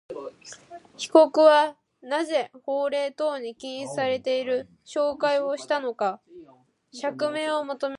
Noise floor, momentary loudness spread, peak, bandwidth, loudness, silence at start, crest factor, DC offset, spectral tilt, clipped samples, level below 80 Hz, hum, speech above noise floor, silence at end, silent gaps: -57 dBFS; 20 LU; -2 dBFS; 11 kHz; -24 LUFS; 0.1 s; 22 dB; under 0.1%; -3.5 dB/octave; under 0.1%; -74 dBFS; none; 33 dB; 0 s; none